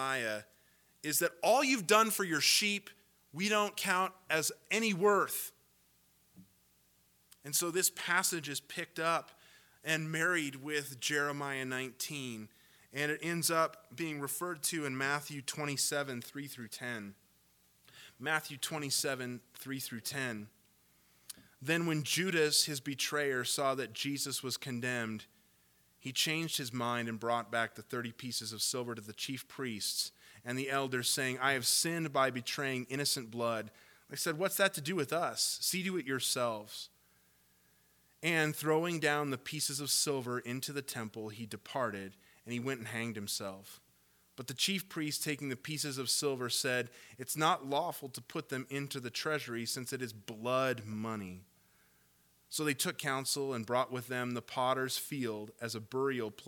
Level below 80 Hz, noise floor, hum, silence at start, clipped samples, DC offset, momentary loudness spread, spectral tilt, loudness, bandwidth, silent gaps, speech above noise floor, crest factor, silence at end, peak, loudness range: -82 dBFS; -70 dBFS; none; 0 s; under 0.1%; under 0.1%; 13 LU; -2.5 dB/octave; -34 LUFS; 19 kHz; none; 35 dB; 26 dB; 0 s; -12 dBFS; 6 LU